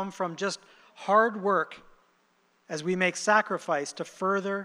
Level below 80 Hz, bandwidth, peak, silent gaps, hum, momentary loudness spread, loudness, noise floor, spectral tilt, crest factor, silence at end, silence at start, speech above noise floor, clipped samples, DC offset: -74 dBFS; 12.5 kHz; -8 dBFS; none; none; 13 LU; -27 LUFS; -68 dBFS; -4 dB/octave; 20 dB; 0 s; 0 s; 40 dB; under 0.1%; under 0.1%